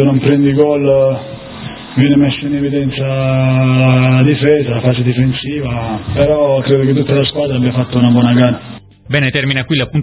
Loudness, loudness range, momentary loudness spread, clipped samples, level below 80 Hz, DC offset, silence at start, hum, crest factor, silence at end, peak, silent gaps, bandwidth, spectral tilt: -12 LUFS; 1 LU; 9 LU; under 0.1%; -38 dBFS; under 0.1%; 0 s; none; 12 dB; 0 s; 0 dBFS; none; 4 kHz; -11.5 dB/octave